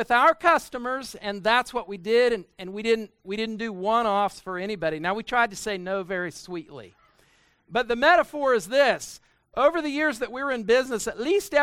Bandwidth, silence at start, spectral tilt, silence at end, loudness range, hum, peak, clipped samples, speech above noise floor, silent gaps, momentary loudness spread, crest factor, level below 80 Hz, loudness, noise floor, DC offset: 16 kHz; 0 s; -3.5 dB/octave; 0 s; 5 LU; none; -4 dBFS; under 0.1%; 38 dB; none; 12 LU; 20 dB; -58 dBFS; -24 LUFS; -62 dBFS; under 0.1%